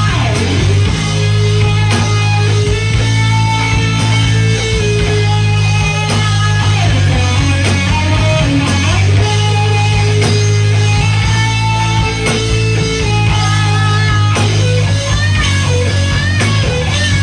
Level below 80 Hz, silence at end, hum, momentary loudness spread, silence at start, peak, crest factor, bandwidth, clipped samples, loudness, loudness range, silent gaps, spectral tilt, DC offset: -24 dBFS; 0 s; none; 2 LU; 0 s; -2 dBFS; 10 dB; 10 kHz; under 0.1%; -12 LUFS; 1 LU; none; -5 dB/octave; under 0.1%